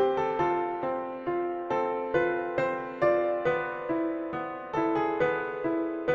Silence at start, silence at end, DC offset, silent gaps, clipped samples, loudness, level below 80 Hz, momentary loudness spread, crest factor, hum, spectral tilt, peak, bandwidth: 0 s; 0 s; under 0.1%; none; under 0.1%; -29 LUFS; -62 dBFS; 6 LU; 16 dB; none; -7.5 dB/octave; -12 dBFS; 7 kHz